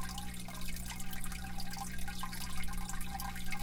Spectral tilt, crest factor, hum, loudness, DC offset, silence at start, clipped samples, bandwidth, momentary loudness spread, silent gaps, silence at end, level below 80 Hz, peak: -3 dB/octave; 14 dB; 60 Hz at -50 dBFS; -43 LUFS; under 0.1%; 0 s; under 0.1%; 18 kHz; 2 LU; none; 0 s; -44 dBFS; -22 dBFS